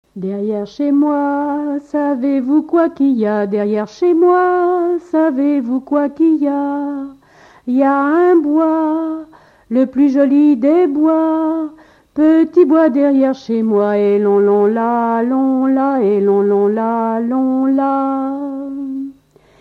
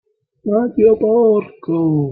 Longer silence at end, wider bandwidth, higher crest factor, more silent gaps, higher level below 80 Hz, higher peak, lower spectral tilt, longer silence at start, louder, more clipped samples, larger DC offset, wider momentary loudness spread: first, 0.5 s vs 0 s; first, 6.4 kHz vs 3.5 kHz; about the same, 12 dB vs 12 dB; neither; second, -60 dBFS vs -52 dBFS; about the same, -2 dBFS vs -2 dBFS; second, -8.5 dB/octave vs -13 dB/octave; second, 0.15 s vs 0.45 s; about the same, -14 LUFS vs -15 LUFS; neither; neither; about the same, 10 LU vs 8 LU